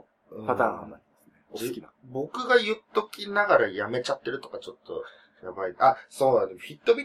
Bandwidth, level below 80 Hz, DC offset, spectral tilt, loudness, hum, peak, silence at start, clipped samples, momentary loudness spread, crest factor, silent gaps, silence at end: 15 kHz; -72 dBFS; under 0.1%; -4.5 dB/octave; -26 LUFS; none; -8 dBFS; 0.3 s; under 0.1%; 18 LU; 20 dB; none; 0 s